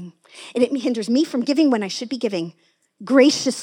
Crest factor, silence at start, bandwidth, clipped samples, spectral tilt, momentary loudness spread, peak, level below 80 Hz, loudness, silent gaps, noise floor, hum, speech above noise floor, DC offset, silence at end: 18 dB; 0 s; 14.5 kHz; under 0.1%; -4 dB/octave; 19 LU; -2 dBFS; -84 dBFS; -20 LUFS; none; -39 dBFS; none; 20 dB; under 0.1%; 0 s